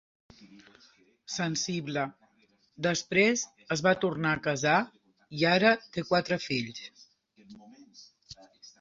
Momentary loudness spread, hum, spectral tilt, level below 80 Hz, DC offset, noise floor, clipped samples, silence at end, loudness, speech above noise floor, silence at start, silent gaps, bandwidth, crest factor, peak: 19 LU; none; -4 dB/octave; -68 dBFS; under 0.1%; -68 dBFS; under 0.1%; 0.15 s; -28 LUFS; 39 dB; 0.4 s; none; 7.8 kHz; 22 dB; -10 dBFS